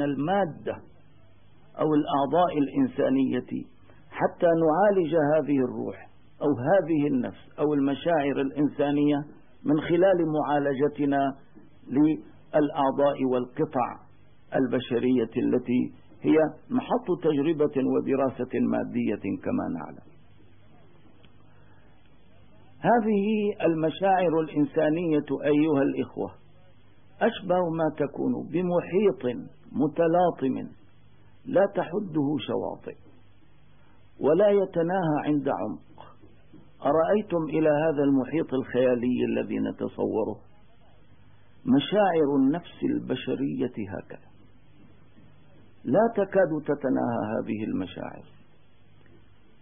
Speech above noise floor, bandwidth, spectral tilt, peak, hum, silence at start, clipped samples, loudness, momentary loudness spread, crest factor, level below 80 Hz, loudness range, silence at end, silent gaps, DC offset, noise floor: 35 dB; 3.7 kHz; -11.5 dB/octave; -10 dBFS; none; 0 s; under 0.1%; -26 LUFS; 11 LU; 16 dB; -64 dBFS; 5 LU; 1.4 s; none; 0.3%; -60 dBFS